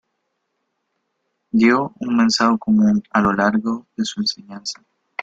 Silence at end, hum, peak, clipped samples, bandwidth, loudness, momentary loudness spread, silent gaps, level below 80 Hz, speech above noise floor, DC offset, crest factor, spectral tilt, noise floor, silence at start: 0 s; none; -2 dBFS; under 0.1%; 8 kHz; -18 LUFS; 14 LU; none; -54 dBFS; 56 dB; under 0.1%; 18 dB; -4.5 dB/octave; -73 dBFS; 1.55 s